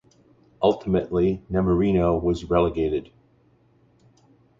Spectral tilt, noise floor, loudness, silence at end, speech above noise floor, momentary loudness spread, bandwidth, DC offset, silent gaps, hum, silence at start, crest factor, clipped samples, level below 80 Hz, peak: -8.5 dB/octave; -60 dBFS; -23 LUFS; 1.55 s; 38 dB; 5 LU; 7.6 kHz; under 0.1%; none; none; 0.6 s; 18 dB; under 0.1%; -40 dBFS; -6 dBFS